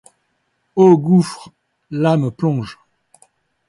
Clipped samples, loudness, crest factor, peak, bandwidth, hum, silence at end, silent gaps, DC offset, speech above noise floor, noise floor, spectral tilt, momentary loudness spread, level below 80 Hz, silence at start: under 0.1%; -16 LUFS; 16 dB; -2 dBFS; 11.5 kHz; none; 0.95 s; none; under 0.1%; 53 dB; -67 dBFS; -8 dB/octave; 17 LU; -60 dBFS; 0.75 s